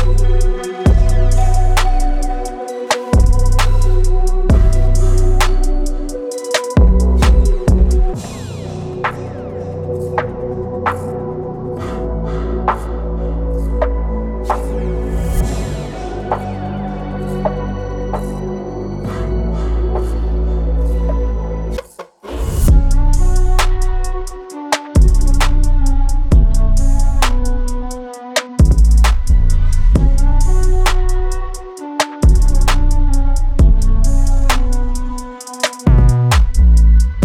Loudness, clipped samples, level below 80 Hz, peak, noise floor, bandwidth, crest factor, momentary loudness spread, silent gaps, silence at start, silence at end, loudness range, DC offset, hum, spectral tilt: -17 LUFS; under 0.1%; -12 dBFS; -2 dBFS; -34 dBFS; 13.5 kHz; 10 dB; 12 LU; none; 0 s; 0 s; 6 LU; under 0.1%; none; -6 dB/octave